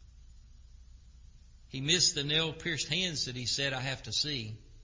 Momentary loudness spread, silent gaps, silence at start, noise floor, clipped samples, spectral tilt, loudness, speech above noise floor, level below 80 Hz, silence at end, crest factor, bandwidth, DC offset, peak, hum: 12 LU; none; 0.1 s; -55 dBFS; under 0.1%; -2.5 dB/octave; -30 LUFS; 22 dB; -54 dBFS; 0 s; 22 dB; 7.8 kHz; under 0.1%; -12 dBFS; none